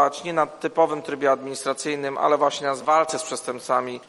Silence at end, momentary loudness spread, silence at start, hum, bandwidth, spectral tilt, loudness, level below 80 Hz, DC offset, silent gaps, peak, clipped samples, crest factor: 0.05 s; 7 LU; 0 s; none; 12 kHz; -3.5 dB/octave; -23 LUFS; -72 dBFS; under 0.1%; none; -6 dBFS; under 0.1%; 18 dB